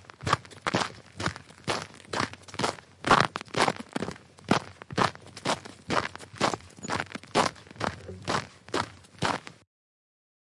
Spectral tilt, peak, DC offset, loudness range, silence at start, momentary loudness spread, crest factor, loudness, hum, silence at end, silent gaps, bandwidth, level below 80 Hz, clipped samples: -4 dB/octave; -8 dBFS; under 0.1%; 4 LU; 0.2 s; 9 LU; 22 dB; -30 LUFS; none; 0.95 s; none; 11.5 kHz; -60 dBFS; under 0.1%